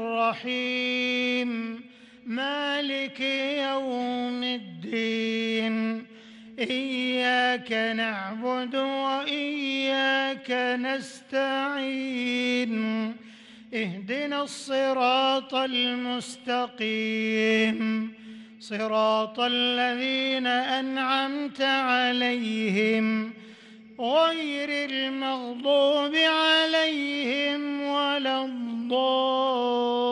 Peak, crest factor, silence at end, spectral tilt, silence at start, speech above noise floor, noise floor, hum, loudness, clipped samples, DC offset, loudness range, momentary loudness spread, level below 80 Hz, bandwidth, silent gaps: -10 dBFS; 16 dB; 0 s; -4 dB/octave; 0 s; 22 dB; -48 dBFS; none; -26 LUFS; under 0.1%; under 0.1%; 5 LU; 9 LU; -78 dBFS; 11 kHz; none